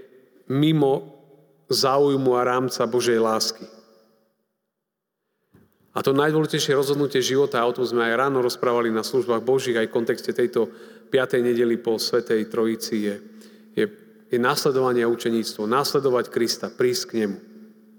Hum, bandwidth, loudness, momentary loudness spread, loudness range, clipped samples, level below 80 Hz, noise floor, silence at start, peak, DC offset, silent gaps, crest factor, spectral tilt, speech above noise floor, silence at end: none; over 20 kHz; -22 LUFS; 7 LU; 4 LU; under 0.1%; -78 dBFS; -82 dBFS; 0.5 s; -6 dBFS; under 0.1%; none; 18 dB; -4.5 dB/octave; 60 dB; 0.35 s